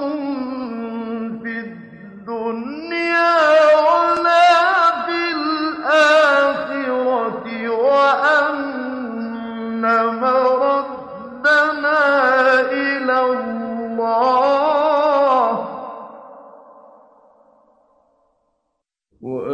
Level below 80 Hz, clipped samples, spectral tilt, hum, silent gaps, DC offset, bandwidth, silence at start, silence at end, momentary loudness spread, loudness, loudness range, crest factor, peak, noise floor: -64 dBFS; under 0.1%; -4 dB/octave; none; none; under 0.1%; 9.8 kHz; 0 s; 0 s; 15 LU; -17 LUFS; 6 LU; 14 dB; -4 dBFS; -76 dBFS